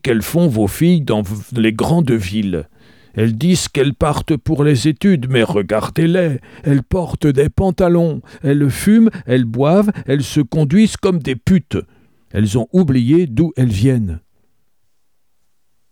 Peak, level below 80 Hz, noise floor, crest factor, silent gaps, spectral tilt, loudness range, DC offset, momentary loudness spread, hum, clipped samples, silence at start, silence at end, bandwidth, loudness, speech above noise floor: -2 dBFS; -36 dBFS; -70 dBFS; 14 dB; none; -7 dB/octave; 2 LU; 0.2%; 7 LU; none; under 0.1%; 0.05 s; 1.75 s; 18.5 kHz; -15 LUFS; 56 dB